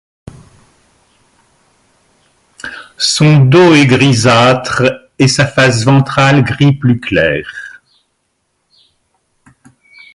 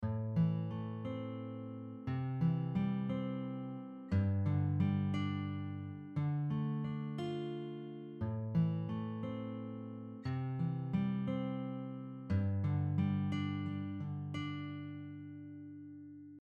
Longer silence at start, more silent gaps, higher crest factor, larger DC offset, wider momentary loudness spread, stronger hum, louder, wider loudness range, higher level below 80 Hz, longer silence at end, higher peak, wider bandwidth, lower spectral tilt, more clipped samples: first, 2.65 s vs 0 s; neither; about the same, 12 dB vs 16 dB; neither; first, 21 LU vs 12 LU; neither; first, -9 LUFS vs -38 LUFS; first, 10 LU vs 4 LU; first, -42 dBFS vs -66 dBFS; first, 2.45 s vs 0 s; first, 0 dBFS vs -22 dBFS; first, 11.5 kHz vs 7 kHz; second, -5.5 dB/octave vs -9.5 dB/octave; neither